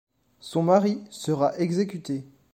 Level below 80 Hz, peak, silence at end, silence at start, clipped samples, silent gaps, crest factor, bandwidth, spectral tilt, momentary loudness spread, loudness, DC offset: -68 dBFS; -8 dBFS; 0.3 s; 0.45 s; under 0.1%; none; 18 dB; 15.5 kHz; -7 dB/octave; 13 LU; -25 LUFS; under 0.1%